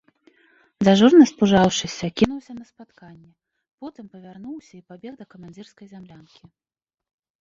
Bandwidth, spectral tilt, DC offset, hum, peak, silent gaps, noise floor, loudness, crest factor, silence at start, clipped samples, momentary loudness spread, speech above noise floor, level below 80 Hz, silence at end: 7.6 kHz; -5.5 dB/octave; under 0.1%; none; -2 dBFS; 3.73-3.78 s; -59 dBFS; -17 LUFS; 20 dB; 0.8 s; under 0.1%; 28 LU; 38 dB; -54 dBFS; 1.4 s